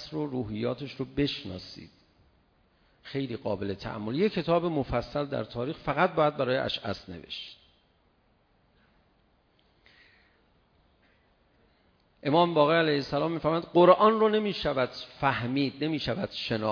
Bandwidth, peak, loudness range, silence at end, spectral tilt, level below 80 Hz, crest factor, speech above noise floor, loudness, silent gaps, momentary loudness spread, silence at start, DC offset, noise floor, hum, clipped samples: 5.4 kHz; -6 dBFS; 11 LU; 0 s; -7.5 dB/octave; -56 dBFS; 24 dB; 40 dB; -28 LUFS; none; 15 LU; 0 s; under 0.1%; -67 dBFS; none; under 0.1%